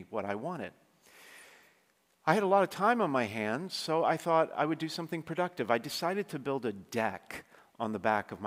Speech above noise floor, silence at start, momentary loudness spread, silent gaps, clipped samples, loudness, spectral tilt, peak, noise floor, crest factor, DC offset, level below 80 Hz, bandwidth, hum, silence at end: 39 dB; 0 s; 12 LU; none; under 0.1%; -32 LUFS; -5 dB/octave; -10 dBFS; -71 dBFS; 24 dB; under 0.1%; -78 dBFS; 16 kHz; none; 0 s